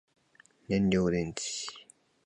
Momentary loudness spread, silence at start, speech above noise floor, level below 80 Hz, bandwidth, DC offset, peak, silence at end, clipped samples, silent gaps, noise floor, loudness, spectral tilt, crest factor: 13 LU; 0.7 s; 34 dB; -54 dBFS; 10.5 kHz; under 0.1%; -14 dBFS; 0.4 s; under 0.1%; none; -63 dBFS; -31 LUFS; -5 dB/octave; 18 dB